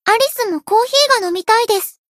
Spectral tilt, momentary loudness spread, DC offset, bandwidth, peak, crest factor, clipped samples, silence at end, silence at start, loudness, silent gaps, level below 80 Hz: 0 dB/octave; 6 LU; under 0.1%; 16 kHz; 0 dBFS; 16 dB; under 0.1%; 0.2 s; 0.05 s; -14 LUFS; none; -68 dBFS